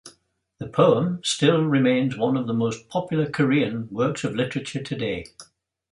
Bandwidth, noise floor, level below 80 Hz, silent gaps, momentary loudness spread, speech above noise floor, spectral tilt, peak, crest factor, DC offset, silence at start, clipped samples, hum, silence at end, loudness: 11.5 kHz; -63 dBFS; -58 dBFS; none; 10 LU; 41 dB; -5.5 dB/octave; -4 dBFS; 18 dB; under 0.1%; 0.05 s; under 0.1%; none; 0.5 s; -23 LUFS